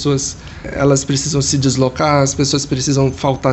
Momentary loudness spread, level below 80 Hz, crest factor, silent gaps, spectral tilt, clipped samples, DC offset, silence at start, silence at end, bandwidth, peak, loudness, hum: 5 LU; -38 dBFS; 14 dB; none; -4.5 dB/octave; under 0.1%; under 0.1%; 0 s; 0 s; 8.6 kHz; -2 dBFS; -15 LUFS; none